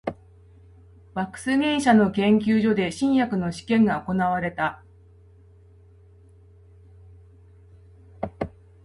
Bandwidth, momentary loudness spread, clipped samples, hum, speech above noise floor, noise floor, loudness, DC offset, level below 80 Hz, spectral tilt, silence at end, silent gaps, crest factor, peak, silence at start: 11.5 kHz; 16 LU; under 0.1%; none; 30 dB; -52 dBFS; -23 LUFS; under 0.1%; -52 dBFS; -6 dB/octave; 0.35 s; none; 18 dB; -6 dBFS; 0.05 s